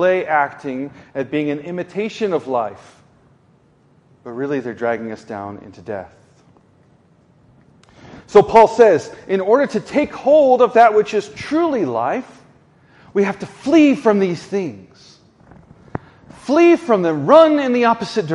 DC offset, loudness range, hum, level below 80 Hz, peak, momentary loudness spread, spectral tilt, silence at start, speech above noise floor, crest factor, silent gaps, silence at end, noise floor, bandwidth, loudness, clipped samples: under 0.1%; 13 LU; none; -56 dBFS; 0 dBFS; 19 LU; -6 dB/octave; 0 s; 38 dB; 18 dB; none; 0 s; -54 dBFS; 11 kHz; -16 LUFS; under 0.1%